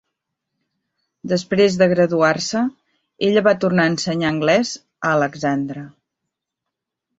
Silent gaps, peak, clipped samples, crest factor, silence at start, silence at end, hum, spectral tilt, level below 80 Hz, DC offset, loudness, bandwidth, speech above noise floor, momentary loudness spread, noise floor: none; -2 dBFS; under 0.1%; 18 dB; 1.25 s; 1.3 s; none; -5 dB/octave; -58 dBFS; under 0.1%; -18 LUFS; 8 kHz; 64 dB; 9 LU; -82 dBFS